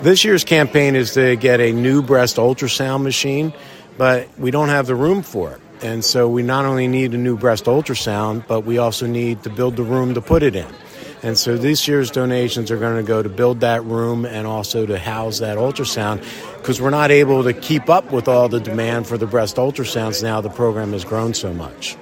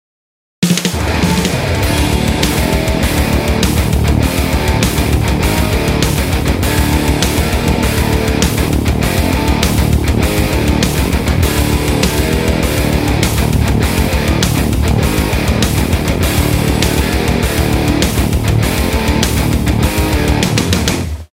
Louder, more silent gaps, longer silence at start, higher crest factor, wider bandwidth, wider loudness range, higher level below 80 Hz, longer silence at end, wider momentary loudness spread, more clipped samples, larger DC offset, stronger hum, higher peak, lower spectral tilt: second, -17 LUFS vs -13 LUFS; neither; second, 0 s vs 0.6 s; about the same, 16 dB vs 12 dB; about the same, 16.5 kHz vs 16.5 kHz; first, 4 LU vs 0 LU; second, -44 dBFS vs -18 dBFS; second, 0 s vs 0.15 s; first, 10 LU vs 1 LU; neither; neither; neither; about the same, 0 dBFS vs 0 dBFS; about the same, -5 dB/octave vs -5 dB/octave